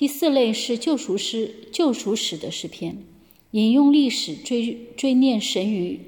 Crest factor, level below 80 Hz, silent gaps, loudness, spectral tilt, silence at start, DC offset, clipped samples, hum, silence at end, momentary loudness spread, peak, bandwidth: 14 dB; -66 dBFS; none; -22 LUFS; -4 dB/octave; 0 s; under 0.1%; under 0.1%; none; 0.05 s; 13 LU; -8 dBFS; 17.5 kHz